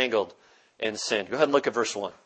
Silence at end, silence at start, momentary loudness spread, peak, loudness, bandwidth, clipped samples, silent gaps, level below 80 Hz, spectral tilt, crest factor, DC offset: 0.15 s; 0 s; 9 LU; -6 dBFS; -27 LUFS; 8.8 kHz; under 0.1%; none; -74 dBFS; -2.5 dB/octave; 20 dB; under 0.1%